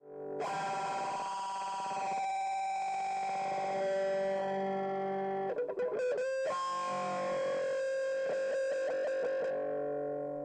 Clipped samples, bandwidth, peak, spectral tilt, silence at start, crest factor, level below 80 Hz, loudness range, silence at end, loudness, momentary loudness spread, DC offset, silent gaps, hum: under 0.1%; 9.4 kHz; -26 dBFS; -4.5 dB/octave; 0.05 s; 8 dB; -78 dBFS; 1 LU; 0 s; -35 LUFS; 3 LU; under 0.1%; none; none